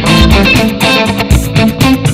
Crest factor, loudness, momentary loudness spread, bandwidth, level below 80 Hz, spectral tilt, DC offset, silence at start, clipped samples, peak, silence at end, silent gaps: 8 dB; -8 LUFS; 4 LU; 16.5 kHz; -16 dBFS; -5 dB/octave; under 0.1%; 0 s; 1%; 0 dBFS; 0 s; none